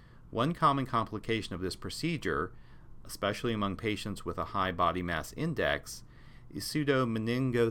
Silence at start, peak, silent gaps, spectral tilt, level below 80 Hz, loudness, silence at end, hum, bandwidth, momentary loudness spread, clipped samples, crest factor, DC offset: 0 s; -14 dBFS; none; -5.5 dB/octave; -52 dBFS; -32 LUFS; 0 s; none; 17.5 kHz; 10 LU; under 0.1%; 18 dB; under 0.1%